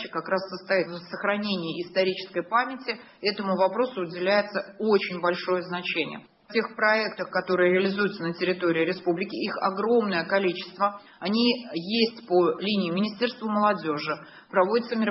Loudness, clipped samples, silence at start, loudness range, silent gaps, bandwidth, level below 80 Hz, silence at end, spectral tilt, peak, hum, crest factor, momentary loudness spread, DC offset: -26 LUFS; under 0.1%; 0 s; 2 LU; none; 5.8 kHz; -72 dBFS; 0 s; -8.5 dB/octave; -8 dBFS; none; 18 dB; 7 LU; under 0.1%